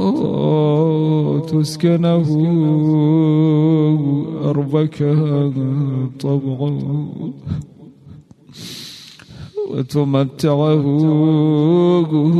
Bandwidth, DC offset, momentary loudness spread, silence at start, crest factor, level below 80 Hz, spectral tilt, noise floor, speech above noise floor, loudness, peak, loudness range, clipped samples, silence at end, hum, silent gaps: 12 kHz; under 0.1%; 13 LU; 0 s; 12 dB; -52 dBFS; -8.5 dB/octave; -41 dBFS; 26 dB; -16 LUFS; -4 dBFS; 9 LU; under 0.1%; 0 s; none; none